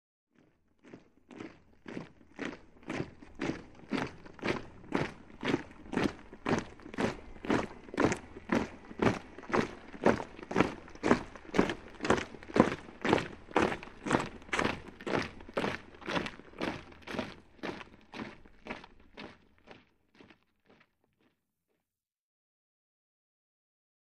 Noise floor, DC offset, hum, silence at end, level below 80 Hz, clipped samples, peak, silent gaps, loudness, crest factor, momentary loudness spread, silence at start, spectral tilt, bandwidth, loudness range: -90 dBFS; 0.1%; none; 4.25 s; -56 dBFS; under 0.1%; -4 dBFS; none; -35 LUFS; 32 dB; 16 LU; 0.85 s; -5.5 dB/octave; 12.5 kHz; 14 LU